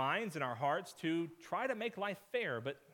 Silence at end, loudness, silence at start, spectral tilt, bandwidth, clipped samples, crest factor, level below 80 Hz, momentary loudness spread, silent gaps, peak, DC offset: 0.15 s; -39 LUFS; 0 s; -5.5 dB/octave; 18 kHz; under 0.1%; 18 dB; -86 dBFS; 4 LU; none; -22 dBFS; under 0.1%